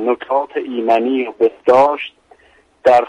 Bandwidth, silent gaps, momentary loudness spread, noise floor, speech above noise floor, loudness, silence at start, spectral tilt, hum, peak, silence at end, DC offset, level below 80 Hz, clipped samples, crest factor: 10.5 kHz; none; 10 LU; -52 dBFS; 37 dB; -16 LUFS; 0 s; -5.5 dB/octave; none; -2 dBFS; 0 s; under 0.1%; -60 dBFS; under 0.1%; 14 dB